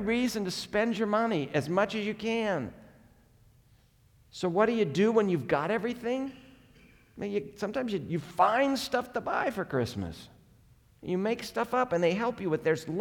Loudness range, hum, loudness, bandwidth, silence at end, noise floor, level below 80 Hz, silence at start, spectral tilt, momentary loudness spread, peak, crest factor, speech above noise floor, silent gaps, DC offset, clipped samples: 3 LU; none; -30 LUFS; 19 kHz; 0 s; -62 dBFS; -62 dBFS; 0 s; -5.5 dB/octave; 9 LU; -10 dBFS; 20 dB; 33 dB; none; under 0.1%; under 0.1%